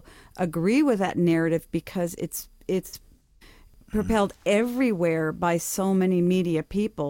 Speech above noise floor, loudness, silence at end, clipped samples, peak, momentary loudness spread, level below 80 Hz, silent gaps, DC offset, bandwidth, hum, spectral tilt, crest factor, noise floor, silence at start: 29 dB; -25 LUFS; 0 s; under 0.1%; -10 dBFS; 9 LU; -48 dBFS; none; under 0.1%; 17 kHz; none; -6 dB/octave; 14 dB; -53 dBFS; 0.35 s